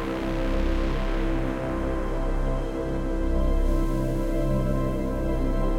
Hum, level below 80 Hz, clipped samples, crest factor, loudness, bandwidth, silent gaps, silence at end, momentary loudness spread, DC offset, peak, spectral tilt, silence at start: none; -26 dBFS; under 0.1%; 12 dB; -28 LUFS; 10.5 kHz; none; 0 s; 3 LU; under 0.1%; -12 dBFS; -7.5 dB/octave; 0 s